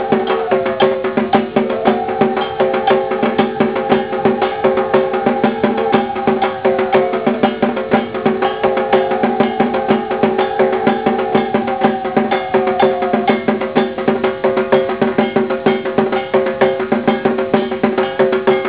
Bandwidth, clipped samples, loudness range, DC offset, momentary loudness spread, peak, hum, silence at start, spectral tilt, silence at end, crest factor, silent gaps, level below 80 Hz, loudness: 4 kHz; under 0.1%; 0 LU; 0.2%; 2 LU; 0 dBFS; none; 0 s; -10 dB/octave; 0 s; 14 dB; none; -50 dBFS; -15 LUFS